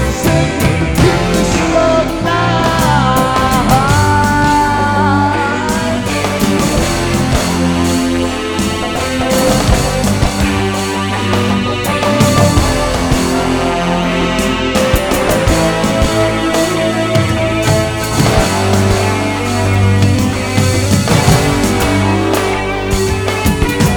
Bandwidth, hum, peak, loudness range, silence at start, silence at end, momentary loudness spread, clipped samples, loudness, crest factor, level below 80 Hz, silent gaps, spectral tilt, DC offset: over 20 kHz; none; 0 dBFS; 2 LU; 0 s; 0 s; 4 LU; under 0.1%; -13 LUFS; 12 dB; -24 dBFS; none; -5 dB/octave; 0.2%